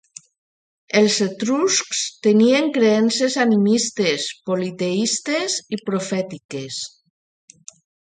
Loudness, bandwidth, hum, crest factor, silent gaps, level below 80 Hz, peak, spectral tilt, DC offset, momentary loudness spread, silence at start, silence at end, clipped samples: -19 LUFS; 9.6 kHz; none; 16 dB; 6.45-6.49 s; -68 dBFS; -4 dBFS; -3.5 dB/octave; under 0.1%; 11 LU; 0.95 s; 1.15 s; under 0.1%